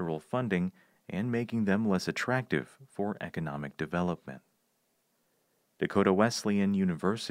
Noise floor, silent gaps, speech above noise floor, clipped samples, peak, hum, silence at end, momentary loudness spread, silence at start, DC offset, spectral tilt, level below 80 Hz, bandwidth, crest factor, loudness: -75 dBFS; none; 45 dB; under 0.1%; -10 dBFS; none; 0 s; 10 LU; 0 s; under 0.1%; -6 dB/octave; -68 dBFS; 15 kHz; 22 dB; -31 LUFS